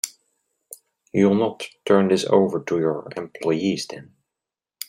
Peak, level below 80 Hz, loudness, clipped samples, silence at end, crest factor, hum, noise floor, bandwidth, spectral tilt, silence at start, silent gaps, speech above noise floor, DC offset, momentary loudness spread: -2 dBFS; -64 dBFS; -21 LUFS; under 0.1%; 0.85 s; 20 dB; none; -87 dBFS; 16 kHz; -5.5 dB/octave; 0.05 s; none; 66 dB; under 0.1%; 15 LU